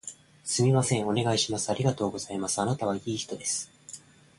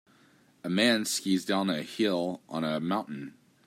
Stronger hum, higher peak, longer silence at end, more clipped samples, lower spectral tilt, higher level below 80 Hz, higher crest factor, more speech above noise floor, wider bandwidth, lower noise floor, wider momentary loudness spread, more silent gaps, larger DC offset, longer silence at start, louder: neither; about the same, -12 dBFS vs -10 dBFS; about the same, 0.4 s vs 0.35 s; neither; about the same, -4.5 dB/octave vs -4 dB/octave; first, -60 dBFS vs -76 dBFS; about the same, 16 dB vs 20 dB; second, 21 dB vs 33 dB; second, 11.5 kHz vs 16 kHz; second, -49 dBFS vs -62 dBFS; about the same, 17 LU vs 16 LU; neither; neither; second, 0.05 s vs 0.65 s; about the same, -28 LUFS vs -29 LUFS